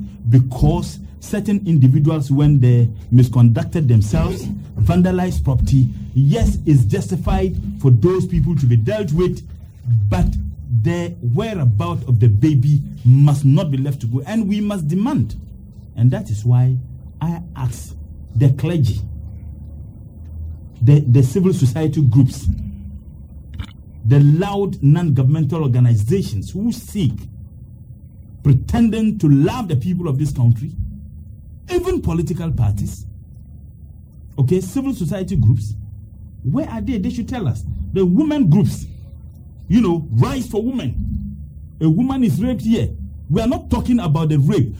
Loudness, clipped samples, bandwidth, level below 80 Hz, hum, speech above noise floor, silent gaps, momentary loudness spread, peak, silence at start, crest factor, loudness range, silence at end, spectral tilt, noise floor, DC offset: -17 LUFS; under 0.1%; 19.5 kHz; -32 dBFS; none; 23 dB; none; 19 LU; 0 dBFS; 0 s; 16 dB; 6 LU; 0 s; -8.5 dB/octave; -38 dBFS; under 0.1%